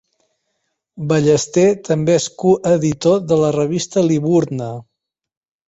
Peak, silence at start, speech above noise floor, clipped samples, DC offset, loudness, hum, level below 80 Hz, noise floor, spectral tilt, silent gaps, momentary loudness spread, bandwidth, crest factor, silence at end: -2 dBFS; 0.95 s; 57 dB; under 0.1%; under 0.1%; -16 LUFS; none; -54 dBFS; -72 dBFS; -6 dB/octave; none; 9 LU; 8.2 kHz; 16 dB; 0.85 s